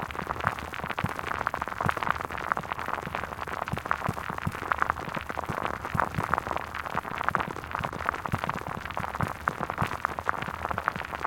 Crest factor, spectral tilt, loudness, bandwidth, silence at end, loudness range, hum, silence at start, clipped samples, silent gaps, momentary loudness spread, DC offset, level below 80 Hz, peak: 26 dB; -5.5 dB/octave; -31 LUFS; 17 kHz; 0 s; 1 LU; none; 0 s; under 0.1%; none; 5 LU; under 0.1%; -48 dBFS; -4 dBFS